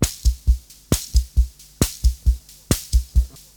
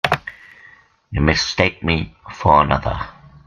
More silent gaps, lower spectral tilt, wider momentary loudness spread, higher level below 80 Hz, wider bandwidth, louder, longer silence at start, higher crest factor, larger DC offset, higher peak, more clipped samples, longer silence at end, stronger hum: neither; about the same, -4.5 dB/octave vs -5 dB/octave; second, 3 LU vs 16 LU; first, -22 dBFS vs -34 dBFS; first, 19.5 kHz vs 14.5 kHz; second, -23 LUFS vs -18 LUFS; about the same, 0 s vs 0.05 s; about the same, 18 dB vs 20 dB; neither; about the same, -2 dBFS vs 0 dBFS; neither; about the same, 0.3 s vs 0.35 s; neither